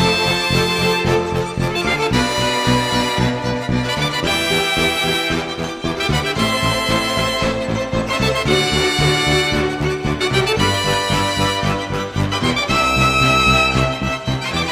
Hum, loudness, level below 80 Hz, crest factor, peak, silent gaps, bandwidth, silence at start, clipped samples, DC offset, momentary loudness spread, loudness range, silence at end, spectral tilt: none; -17 LUFS; -32 dBFS; 16 dB; -2 dBFS; none; 15.5 kHz; 0 s; under 0.1%; under 0.1%; 7 LU; 2 LU; 0 s; -4 dB/octave